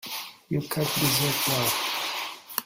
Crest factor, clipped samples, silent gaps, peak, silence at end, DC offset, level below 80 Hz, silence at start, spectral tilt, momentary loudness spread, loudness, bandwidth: 22 dB; under 0.1%; none; -6 dBFS; 0 s; under 0.1%; -60 dBFS; 0.05 s; -3 dB/octave; 10 LU; -26 LUFS; 16.5 kHz